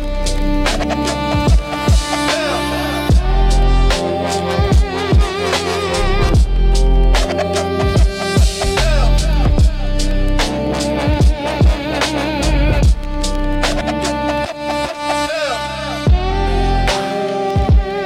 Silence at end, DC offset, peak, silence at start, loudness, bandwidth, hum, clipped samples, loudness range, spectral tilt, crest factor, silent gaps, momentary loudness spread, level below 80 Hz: 0 s; under 0.1%; -2 dBFS; 0 s; -16 LUFS; 13.5 kHz; none; under 0.1%; 2 LU; -5 dB/octave; 12 dB; none; 4 LU; -16 dBFS